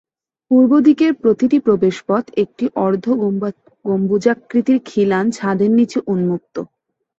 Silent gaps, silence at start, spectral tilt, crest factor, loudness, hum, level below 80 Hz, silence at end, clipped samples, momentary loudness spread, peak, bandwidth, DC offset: none; 0.5 s; -7.5 dB/octave; 14 dB; -16 LUFS; none; -60 dBFS; 0.55 s; under 0.1%; 10 LU; -2 dBFS; 8 kHz; under 0.1%